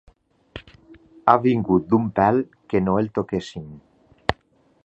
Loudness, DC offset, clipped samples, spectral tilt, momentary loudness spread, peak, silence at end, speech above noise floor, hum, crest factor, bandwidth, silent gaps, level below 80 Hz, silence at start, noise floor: -21 LUFS; under 0.1%; under 0.1%; -8 dB/octave; 23 LU; 0 dBFS; 0.5 s; 40 dB; none; 22 dB; 8.2 kHz; none; -48 dBFS; 0.55 s; -61 dBFS